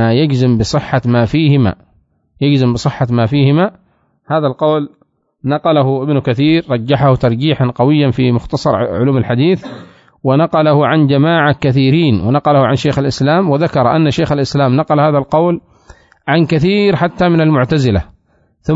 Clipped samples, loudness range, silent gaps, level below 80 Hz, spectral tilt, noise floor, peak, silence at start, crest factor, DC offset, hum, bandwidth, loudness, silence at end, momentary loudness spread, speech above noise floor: under 0.1%; 3 LU; none; -40 dBFS; -7.5 dB/octave; -55 dBFS; 0 dBFS; 0 s; 12 dB; under 0.1%; none; 7.8 kHz; -12 LUFS; 0 s; 5 LU; 44 dB